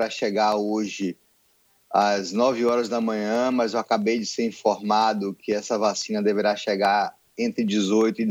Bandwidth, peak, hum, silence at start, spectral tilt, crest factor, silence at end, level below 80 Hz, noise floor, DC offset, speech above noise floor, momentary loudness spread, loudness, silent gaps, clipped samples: 16 kHz; -6 dBFS; none; 0 s; -4.5 dB/octave; 16 dB; 0 s; -72 dBFS; -63 dBFS; under 0.1%; 40 dB; 7 LU; -23 LUFS; none; under 0.1%